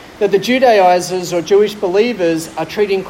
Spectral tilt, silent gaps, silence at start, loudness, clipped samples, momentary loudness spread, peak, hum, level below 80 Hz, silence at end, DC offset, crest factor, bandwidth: -4.5 dB/octave; none; 0 s; -14 LUFS; under 0.1%; 9 LU; 0 dBFS; none; -52 dBFS; 0 s; under 0.1%; 12 dB; 16.5 kHz